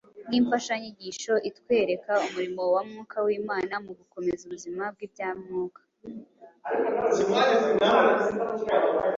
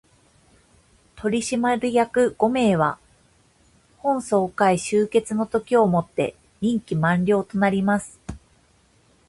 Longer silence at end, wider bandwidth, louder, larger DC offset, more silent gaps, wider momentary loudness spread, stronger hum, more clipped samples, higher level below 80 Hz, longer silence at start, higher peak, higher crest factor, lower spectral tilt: second, 0 s vs 0.9 s; second, 7.8 kHz vs 11.5 kHz; second, -26 LUFS vs -22 LUFS; neither; neither; first, 15 LU vs 9 LU; neither; neither; second, -66 dBFS vs -54 dBFS; second, 0.15 s vs 1.15 s; about the same, -8 dBFS vs -6 dBFS; about the same, 18 dB vs 18 dB; second, -4 dB/octave vs -6 dB/octave